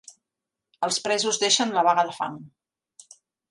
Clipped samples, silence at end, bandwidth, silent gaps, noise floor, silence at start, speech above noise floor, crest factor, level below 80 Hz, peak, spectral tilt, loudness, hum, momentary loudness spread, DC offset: under 0.1%; 1.05 s; 11.5 kHz; none; -86 dBFS; 0.8 s; 63 dB; 20 dB; -78 dBFS; -6 dBFS; -1.5 dB/octave; -23 LUFS; none; 12 LU; under 0.1%